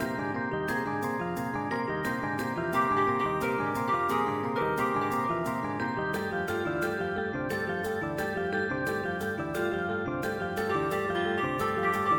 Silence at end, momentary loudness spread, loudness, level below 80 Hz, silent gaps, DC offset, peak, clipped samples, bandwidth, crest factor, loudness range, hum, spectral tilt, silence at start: 0 s; 4 LU; -30 LUFS; -56 dBFS; none; under 0.1%; -14 dBFS; under 0.1%; 17.5 kHz; 14 dB; 3 LU; none; -6 dB/octave; 0 s